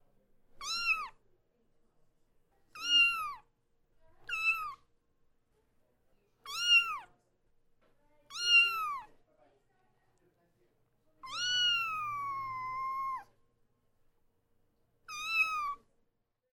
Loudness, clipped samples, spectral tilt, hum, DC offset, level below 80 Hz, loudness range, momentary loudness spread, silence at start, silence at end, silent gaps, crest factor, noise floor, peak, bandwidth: -30 LUFS; under 0.1%; 2 dB/octave; none; under 0.1%; -68 dBFS; 8 LU; 19 LU; 0.55 s; 0.8 s; none; 20 dB; -79 dBFS; -16 dBFS; 17 kHz